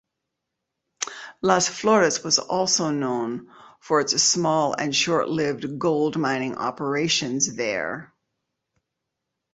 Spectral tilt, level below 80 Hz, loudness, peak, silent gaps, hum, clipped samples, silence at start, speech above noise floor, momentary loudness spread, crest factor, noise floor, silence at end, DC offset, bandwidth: -3 dB/octave; -64 dBFS; -22 LUFS; -4 dBFS; none; none; under 0.1%; 1 s; 59 dB; 12 LU; 20 dB; -82 dBFS; 1.5 s; under 0.1%; 8.4 kHz